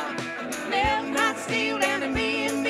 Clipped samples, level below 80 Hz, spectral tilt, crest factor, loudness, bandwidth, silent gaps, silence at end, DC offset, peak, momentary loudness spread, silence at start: under 0.1%; -46 dBFS; -3 dB/octave; 16 dB; -25 LUFS; 15.5 kHz; none; 0 s; under 0.1%; -10 dBFS; 8 LU; 0 s